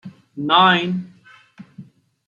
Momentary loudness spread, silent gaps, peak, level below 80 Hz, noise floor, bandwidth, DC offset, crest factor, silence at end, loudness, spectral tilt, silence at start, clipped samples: 17 LU; none; -2 dBFS; -68 dBFS; -45 dBFS; 7.2 kHz; under 0.1%; 20 dB; 0.45 s; -17 LUFS; -6 dB/octave; 0.05 s; under 0.1%